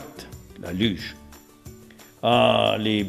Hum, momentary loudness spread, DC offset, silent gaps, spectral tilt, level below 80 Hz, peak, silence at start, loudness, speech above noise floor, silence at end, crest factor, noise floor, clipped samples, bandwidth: none; 22 LU; under 0.1%; none; -5.5 dB/octave; -52 dBFS; -4 dBFS; 0 s; -22 LUFS; 27 dB; 0 s; 22 dB; -48 dBFS; under 0.1%; 14.5 kHz